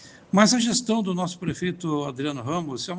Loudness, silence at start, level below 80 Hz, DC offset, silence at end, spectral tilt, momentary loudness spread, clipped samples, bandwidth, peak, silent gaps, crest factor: -24 LUFS; 0 s; -62 dBFS; under 0.1%; 0 s; -4 dB/octave; 10 LU; under 0.1%; 10 kHz; 0 dBFS; none; 24 dB